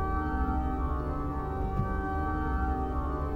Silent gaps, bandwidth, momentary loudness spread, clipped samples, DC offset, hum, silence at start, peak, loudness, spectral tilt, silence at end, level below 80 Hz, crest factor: none; 4.9 kHz; 3 LU; under 0.1%; under 0.1%; none; 0 s; -16 dBFS; -32 LUFS; -9.5 dB/octave; 0 s; -32 dBFS; 14 dB